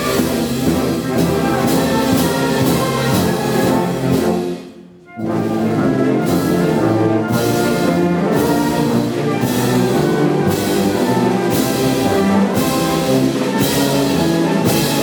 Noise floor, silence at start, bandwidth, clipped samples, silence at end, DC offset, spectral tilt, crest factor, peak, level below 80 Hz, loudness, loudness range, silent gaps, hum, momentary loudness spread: -38 dBFS; 0 s; over 20 kHz; under 0.1%; 0 s; under 0.1%; -5.5 dB/octave; 12 dB; -2 dBFS; -44 dBFS; -16 LUFS; 2 LU; none; none; 3 LU